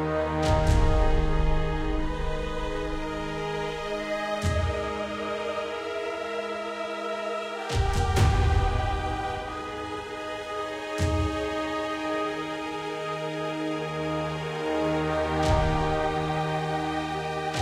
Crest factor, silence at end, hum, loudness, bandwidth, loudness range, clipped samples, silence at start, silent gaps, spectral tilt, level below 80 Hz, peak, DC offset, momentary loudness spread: 16 dB; 0 s; none; -28 LUFS; 14.5 kHz; 3 LU; under 0.1%; 0 s; none; -6 dB/octave; -32 dBFS; -10 dBFS; under 0.1%; 8 LU